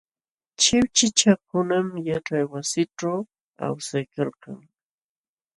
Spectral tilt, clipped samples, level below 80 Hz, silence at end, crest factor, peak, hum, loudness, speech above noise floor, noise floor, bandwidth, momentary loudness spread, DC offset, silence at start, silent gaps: -3.5 dB/octave; under 0.1%; -58 dBFS; 1 s; 22 dB; -4 dBFS; none; -23 LUFS; over 66 dB; under -90 dBFS; 11.5 kHz; 14 LU; under 0.1%; 0.6 s; 3.41-3.51 s